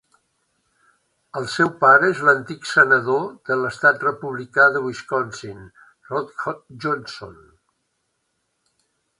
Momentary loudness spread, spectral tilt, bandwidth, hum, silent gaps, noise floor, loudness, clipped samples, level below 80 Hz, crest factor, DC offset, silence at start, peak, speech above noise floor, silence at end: 16 LU; -5 dB/octave; 11.5 kHz; none; none; -73 dBFS; -19 LUFS; under 0.1%; -64 dBFS; 22 dB; under 0.1%; 1.35 s; 0 dBFS; 53 dB; 1.85 s